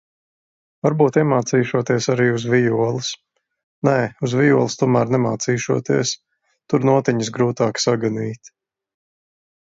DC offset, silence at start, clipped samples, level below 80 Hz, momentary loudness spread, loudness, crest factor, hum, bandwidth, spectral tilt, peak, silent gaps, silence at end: under 0.1%; 0.85 s; under 0.1%; -60 dBFS; 8 LU; -19 LUFS; 18 dB; none; 7.8 kHz; -5.5 dB/octave; -2 dBFS; 3.63-3.82 s; 1.15 s